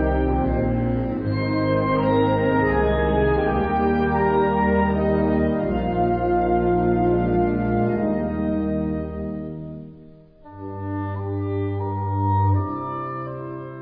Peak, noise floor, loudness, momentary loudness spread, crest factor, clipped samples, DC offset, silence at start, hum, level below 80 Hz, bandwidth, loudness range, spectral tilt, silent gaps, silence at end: -8 dBFS; -46 dBFS; -22 LUFS; 11 LU; 14 dB; under 0.1%; under 0.1%; 0 s; none; -34 dBFS; 5 kHz; 8 LU; -11.5 dB/octave; none; 0 s